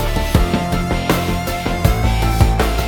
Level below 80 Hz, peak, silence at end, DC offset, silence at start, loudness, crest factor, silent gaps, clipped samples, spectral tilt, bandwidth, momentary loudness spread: -20 dBFS; 0 dBFS; 0 s; under 0.1%; 0 s; -17 LUFS; 16 dB; none; under 0.1%; -5.5 dB/octave; 20 kHz; 4 LU